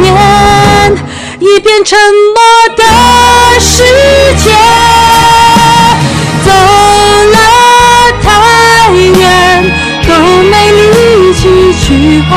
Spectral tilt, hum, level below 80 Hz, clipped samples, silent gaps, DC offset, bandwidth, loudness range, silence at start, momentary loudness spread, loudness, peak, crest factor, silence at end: -4 dB/octave; none; -20 dBFS; 8%; none; under 0.1%; 17 kHz; 1 LU; 0 s; 4 LU; -3 LUFS; 0 dBFS; 4 dB; 0 s